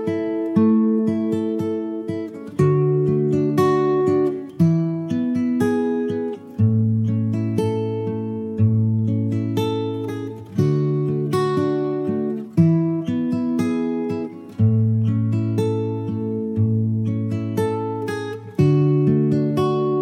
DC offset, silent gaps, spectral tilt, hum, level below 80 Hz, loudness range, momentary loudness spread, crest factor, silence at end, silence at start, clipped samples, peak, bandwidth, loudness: under 0.1%; none; -9 dB/octave; none; -58 dBFS; 3 LU; 8 LU; 16 dB; 0 s; 0 s; under 0.1%; -4 dBFS; 13 kHz; -21 LUFS